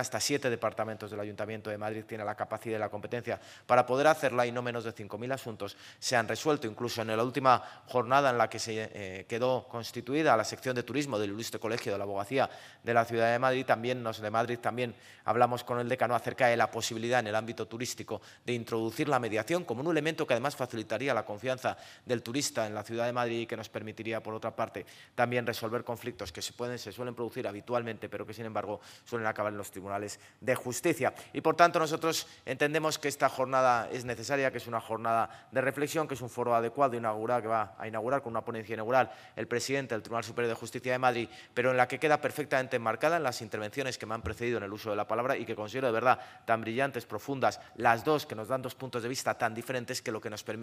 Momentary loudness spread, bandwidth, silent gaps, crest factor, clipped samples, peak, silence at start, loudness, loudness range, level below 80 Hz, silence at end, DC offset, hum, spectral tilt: 11 LU; 15.5 kHz; none; 26 dB; under 0.1%; -6 dBFS; 0 s; -32 LUFS; 5 LU; -68 dBFS; 0 s; under 0.1%; none; -4.5 dB/octave